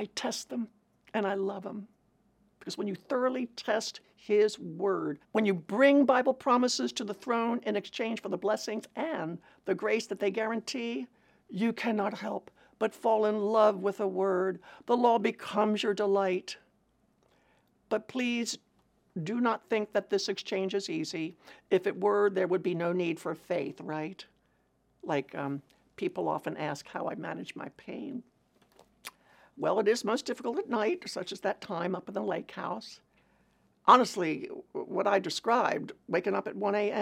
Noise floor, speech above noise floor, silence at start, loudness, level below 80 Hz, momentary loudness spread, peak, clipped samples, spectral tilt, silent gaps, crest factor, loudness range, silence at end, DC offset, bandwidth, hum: -71 dBFS; 41 dB; 0 s; -31 LUFS; -78 dBFS; 14 LU; -6 dBFS; under 0.1%; -4.5 dB/octave; none; 24 dB; 9 LU; 0 s; under 0.1%; 15.5 kHz; none